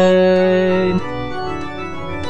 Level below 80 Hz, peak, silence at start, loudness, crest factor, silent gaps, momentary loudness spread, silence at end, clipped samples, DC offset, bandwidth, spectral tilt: -42 dBFS; -4 dBFS; 0 s; -17 LUFS; 14 dB; none; 14 LU; 0 s; under 0.1%; 3%; 8.8 kHz; -7 dB/octave